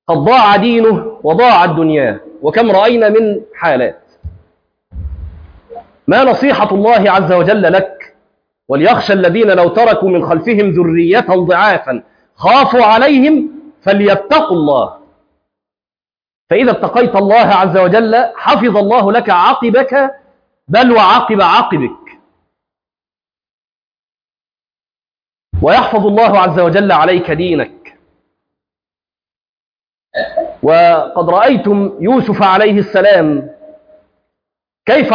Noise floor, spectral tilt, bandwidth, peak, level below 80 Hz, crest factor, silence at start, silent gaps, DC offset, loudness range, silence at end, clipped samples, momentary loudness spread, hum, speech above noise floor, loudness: under -90 dBFS; -7.5 dB/octave; 5.2 kHz; 0 dBFS; -40 dBFS; 12 dB; 0.1 s; 16.35-16.47 s, 23.51-23.62 s, 23.69-23.92 s, 23.99-24.18 s, 24.24-24.28 s, 29.48-29.75 s; under 0.1%; 6 LU; 0 s; under 0.1%; 10 LU; none; over 81 dB; -10 LUFS